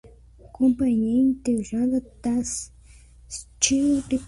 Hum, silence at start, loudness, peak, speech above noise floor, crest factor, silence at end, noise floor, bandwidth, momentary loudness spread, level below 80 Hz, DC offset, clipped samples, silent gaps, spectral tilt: none; 0.45 s; -23 LUFS; -6 dBFS; 27 dB; 18 dB; 0 s; -49 dBFS; 11.5 kHz; 16 LU; -48 dBFS; under 0.1%; under 0.1%; none; -3.5 dB/octave